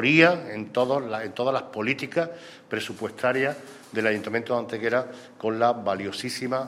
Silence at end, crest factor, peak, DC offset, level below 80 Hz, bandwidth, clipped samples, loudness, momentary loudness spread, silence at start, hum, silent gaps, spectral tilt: 0 s; 24 dB; -2 dBFS; under 0.1%; -72 dBFS; 15 kHz; under 0.1%; -26 LUFS; 9 LU; 0 s; none; none; -5 dB/octave